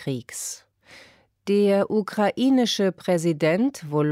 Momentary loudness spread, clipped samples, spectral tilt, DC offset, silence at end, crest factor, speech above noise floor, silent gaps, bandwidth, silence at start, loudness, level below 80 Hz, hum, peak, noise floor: 12 LU; under 0.1%; -5.5 dB/octave; under 0.1%; 0 s; 14 dB; 31 dB; none; 16 kHz; 0 s; -23 LUFS; -70 dBFS; none; -10 dBFS; -53 dBFS